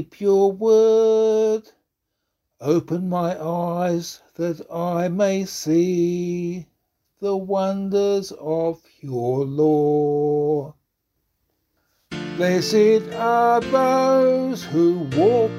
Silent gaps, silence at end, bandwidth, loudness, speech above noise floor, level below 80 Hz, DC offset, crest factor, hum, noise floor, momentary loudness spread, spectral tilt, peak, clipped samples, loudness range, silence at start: none; 0 s; 14.5 kHz; -20 LUFS; 58 dB; -60 dBFS; under 0.1%; 14 dB; none; -78 dBFS; 11 LU; -6.5 dB/octave; -6 dBFS; under 0.1%; 6 LU; 0 s